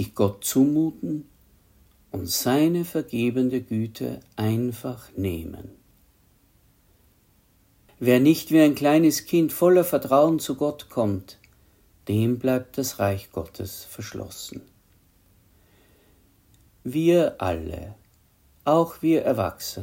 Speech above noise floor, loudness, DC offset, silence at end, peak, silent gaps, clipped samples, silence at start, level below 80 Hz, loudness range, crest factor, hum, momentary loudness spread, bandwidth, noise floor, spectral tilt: 38 dB; -23 LUFS; under 0.1%; 0 s; -6 dBFS; none; under 0.1%; 0 s; -56 dBFS; 13 LU; 20 dB; none; 17 LU; 16.5 kHz; -61 dBFS; -6 dB/octave